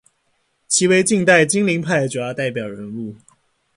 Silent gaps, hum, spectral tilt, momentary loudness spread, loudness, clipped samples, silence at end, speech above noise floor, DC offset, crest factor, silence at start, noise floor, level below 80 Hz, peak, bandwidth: none; none; -4 dB/octave; 16 LU; -17 LUFS; under 0.1%; 0.6 s; 49 dB; under 0.1%; 18 dB; 0.7 s; -66 dBFS; -60 dBFS; 0 dBFS; 11.5 kHz